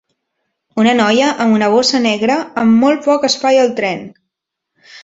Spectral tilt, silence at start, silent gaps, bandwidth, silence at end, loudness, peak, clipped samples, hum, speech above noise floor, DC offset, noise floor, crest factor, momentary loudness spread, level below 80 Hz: -4 dB/octave; 0.75 s; none; 8 kHz; 0.05 s; -13 LUFS; -2 dBFS; under 0.1%; none; 65 dB; under 0.1%; -78 dBFS; 14 dB; 6 LU; -58 dBFS